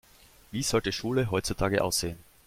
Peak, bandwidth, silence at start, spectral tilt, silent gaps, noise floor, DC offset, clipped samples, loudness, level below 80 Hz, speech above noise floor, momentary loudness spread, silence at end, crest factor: -10 dBFS; 16.5 kHz; 0.5 s; -4 dB/octave; none; -57 dBFS; under 0.1%; under 0.1%; -29 LUFS; -48 dBFS; 28 dB; 6 LU; 0.25 s; 18 dB